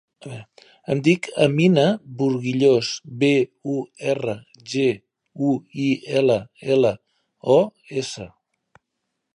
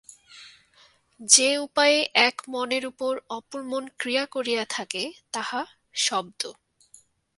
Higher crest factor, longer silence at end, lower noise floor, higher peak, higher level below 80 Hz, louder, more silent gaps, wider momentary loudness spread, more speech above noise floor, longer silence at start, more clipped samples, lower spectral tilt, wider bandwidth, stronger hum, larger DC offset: second, 20 dB vs 26 dB; first, 1.1 s vs 0.85 s; first, -78 dBFS vs -59 dBFS; about the same, -2 dBFS vs 0 dBFS; first, -64 dBFS vs -74 dBFS; first, -21 LUFS vs -24 LUFS; neither; about the same, 17 LU vs 16 LU; first, 58 dB vs 34 dB; about the same, 0.25 s vs 0.35 s; neither; first, -6 dB/octave vs 0 dB/octave; about the same, 10.5 kHz vs 11.5 kHz; neither; neither